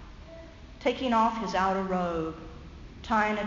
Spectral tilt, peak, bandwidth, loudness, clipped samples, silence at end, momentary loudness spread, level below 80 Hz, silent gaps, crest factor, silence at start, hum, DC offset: -4 dB/octave; -12 dBFS; 7.6 kHz; -28 LUFS; under 0.1%; 0 s; 22 LU; -48 dBFS; none; 16 dB; 0 s; none; under 0.1%